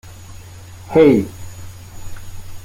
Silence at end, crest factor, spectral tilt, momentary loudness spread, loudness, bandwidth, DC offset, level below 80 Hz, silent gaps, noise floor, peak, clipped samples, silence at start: 0 s; 18 dB; -7 dB/octave; 26 LU; -14 LUFS; 16.5 kHz; under 0.1%; -40 dBFS; none; -37 dBFS; -2 dBFS; under 0.1%; 0.05 s